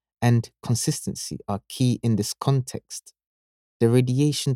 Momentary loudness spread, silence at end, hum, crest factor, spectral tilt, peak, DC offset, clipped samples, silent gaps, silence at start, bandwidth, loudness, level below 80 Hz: 12 LU; 0 s; none; 18 dB; -6 dB/octave; -6 dBFS; under 0.1%; under 0.1%; 3.27-3.80 s; 0.2 s; 15.5 kHz; -24 LUFS; -58 dBFS